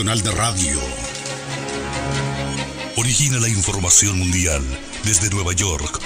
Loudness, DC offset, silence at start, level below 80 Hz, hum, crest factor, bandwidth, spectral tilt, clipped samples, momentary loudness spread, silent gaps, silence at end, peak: -18 LUFS; under 0.1%; 0 s; -34 dBFS; none; 18 dB; 16 kHz; -3 dB/octave; under 0.1%; 13 LU; none; 0 s; -2 dBFS